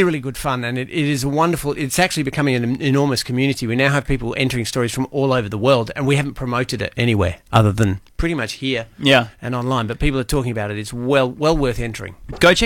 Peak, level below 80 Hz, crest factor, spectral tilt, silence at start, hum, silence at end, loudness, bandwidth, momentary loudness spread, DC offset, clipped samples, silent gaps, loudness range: -2 dBFS; -34 dBFS; 16 dB; -5.5 dB/octave; 0 s; none; 0 s; -19 LUFS; 17.5 kHz; 7 LU; under 0.1%; under 0.1%; none; 1 LU